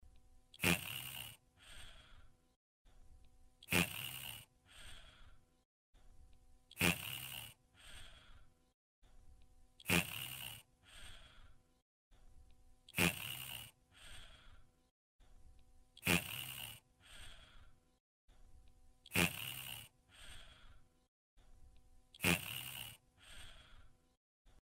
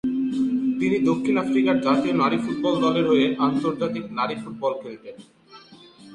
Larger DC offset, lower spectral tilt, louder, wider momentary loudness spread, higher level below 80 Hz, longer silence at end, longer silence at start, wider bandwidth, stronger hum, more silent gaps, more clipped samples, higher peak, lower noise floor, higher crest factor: neither; second, -3 dB/octave vs -6.5 dB/octave; second, -39 LUFS vs -22 LUFS; first, 25 LU vs 8 LU; about the same, -64 dBFS vs -60 dBFS; first, 0.15 s vs 0 s; about the same, 0.05 s vs 0.05 s; first, 16 kHz vs 10 kHz; neither; first, 2.56-2.85 s, 5.65-5.93 s, 8.74-9.02 s, 11.82-12.11 s, 14.91-15.19 s, 18.00-18.28 s, 21.08-21.37 s, 24.17-24.45 s vs none; neither; second, -14 dBFS vs -6 dBFS; first, -64 dBFS vs -48 dBFS; first, 32 dB vs 16 dB